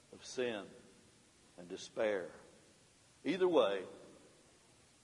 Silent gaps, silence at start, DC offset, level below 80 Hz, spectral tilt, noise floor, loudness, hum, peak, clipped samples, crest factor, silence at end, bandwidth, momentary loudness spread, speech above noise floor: none; 0.1 s; under 0.1%; -82 dBFS; -4.5 dB/octave; -67 dBFS; -37 LUFS; none; -18 dBFS; under 0.1%; 22 dB; 0.9 s; 11.5 kHz; 26 LU; 30 dB